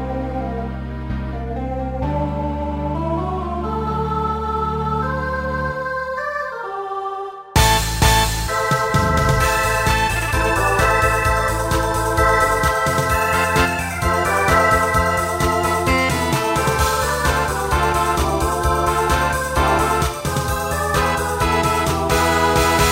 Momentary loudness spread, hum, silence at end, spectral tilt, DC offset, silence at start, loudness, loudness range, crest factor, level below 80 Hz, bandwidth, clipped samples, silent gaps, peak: 9 LU; none; 0 s; -4.5 dB/octave; under 0.1%; 0 s; -18 LUFS; 6 LU; 14 dB; -28 dBFS; 16.5 kHz; under 0.1%; none; -4 dBFS